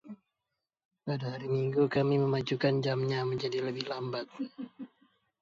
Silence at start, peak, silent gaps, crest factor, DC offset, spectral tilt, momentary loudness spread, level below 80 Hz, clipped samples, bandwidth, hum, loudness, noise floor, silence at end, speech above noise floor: 0.05 s; -16 dBFS; 0.85-0.91 s; 16 dB; under 0.1%; -7.5 dB/octave; 17 LU; -70 dBFS; under 0.1%; 7.4 kHz; none; -32 LUFS; -87 dBFS; 0.55 s; 56 dB